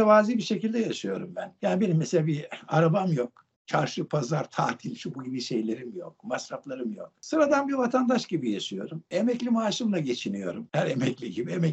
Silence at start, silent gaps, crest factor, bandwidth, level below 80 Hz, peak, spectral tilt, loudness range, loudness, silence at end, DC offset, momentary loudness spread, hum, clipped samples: 0 s; 3.56-3.65 s; 20 dB; 8.2 kHz; -74 dBFS; -8 dBFS; -6 dB/octave; 4 LU; -28 LUFS; 0 s; under 0.1%; 12 LU; none; under 0.1%